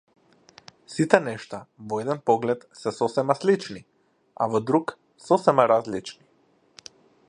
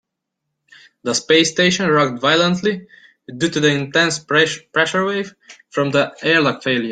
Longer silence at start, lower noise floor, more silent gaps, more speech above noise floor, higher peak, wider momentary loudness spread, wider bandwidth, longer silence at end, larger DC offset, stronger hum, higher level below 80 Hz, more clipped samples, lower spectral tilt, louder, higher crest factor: second, 0.9 s vs 1.05 s; second, -63 dBFS vs -78 dBFS; neither; second, 39 dB vs 61 dB; about the same, 0 dBFS vs -2 dBFS; first, 19 LU vs 10 LU; first, 11 kHz vs 9.6 kHz; first, 1.15 s vs 0 s; neither; neither; second, -70 dBFS vs -60 dBFS; neither; first, -6 dB/octave vs -3.5 dB/octave; second, -24 LUFS vs -17 LUFS; first, 26 dB vs 18 dB